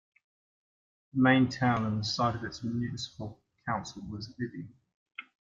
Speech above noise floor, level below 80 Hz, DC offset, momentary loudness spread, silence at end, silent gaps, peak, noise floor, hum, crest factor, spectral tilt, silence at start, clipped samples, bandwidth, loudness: over 60 dB; -62 dBFS; under 0.1%; 22 LU; 0.35 s; 4.94-5.06 s; -10 dBFS; under -90 dBFS; none; 22 dB; -6 dB/octave; 1.15 s; under 0.1%; 7.6 kHz; -30 LUFS